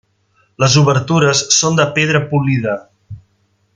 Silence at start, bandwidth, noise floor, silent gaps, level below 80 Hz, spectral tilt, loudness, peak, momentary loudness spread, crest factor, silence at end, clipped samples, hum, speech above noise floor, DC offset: 0.6 s; 9.6 kHz; -60 dBFS; none; -50 dBFS; -4 dB/octave; -13 LUFS; 0 dBFS; 7 LU; 14 dB; 0.6 s; under 0.1%; none; 47 dB; under 0.1%